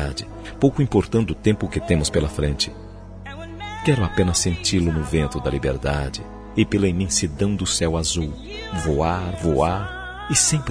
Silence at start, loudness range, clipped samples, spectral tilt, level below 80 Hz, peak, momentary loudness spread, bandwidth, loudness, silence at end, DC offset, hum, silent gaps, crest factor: 0 s; 1 LU; under 0.1%; -4.5 dB/octave; -34 dBFS; -4 dBFS; 13 LU; 11 kHz; -21 LUFS; 0 s; under 0.1%; none; none; 18 dB